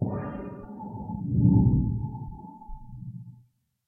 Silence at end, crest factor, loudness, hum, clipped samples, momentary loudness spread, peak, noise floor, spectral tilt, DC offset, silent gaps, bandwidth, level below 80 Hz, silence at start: 0.55 s; 20 dB; -26 LUFS; none; under 0.1%; 24 LU; -8 dBFS; -61 dBFS; -13.5 dB/octave; under 0.1%; none; 2.6 kHz; -40 dBFS; 0 s